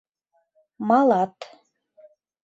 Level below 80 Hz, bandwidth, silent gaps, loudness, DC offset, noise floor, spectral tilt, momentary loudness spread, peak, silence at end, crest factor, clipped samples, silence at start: -74 dBFS; 7.8 kHz; none; -21 LUFS; under 0.1%; -71 dBFS; -7.5 dB/octave; 25 LU; -6 dBFS; 1 s; 18 dB; under 0.1%; 0.8 s